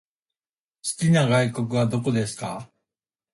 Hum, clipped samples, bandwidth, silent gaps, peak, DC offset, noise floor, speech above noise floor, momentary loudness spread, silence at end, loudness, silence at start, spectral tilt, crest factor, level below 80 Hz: none; under 0.1%; 11.5 kHz; none; -8 dBFS; under 0.1%; under -90 dBFS; over 68 dB; 14 LU; 0.7 s; -23 LUFS; 0.85 s; -5.5 dB/octave; 16 dB; -58 dBFS